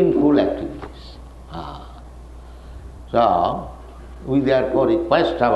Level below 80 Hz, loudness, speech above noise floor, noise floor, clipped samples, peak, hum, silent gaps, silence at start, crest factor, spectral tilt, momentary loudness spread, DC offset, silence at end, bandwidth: -40 dBFS; -19 LUFS; 21 dB; -38 dBFS; under 0.1%; -2 dBFS; none; none; 0 s; 18 dB; -8 dB/octave; 24 LU; under 0.1%; 0 s; 8.6 kHz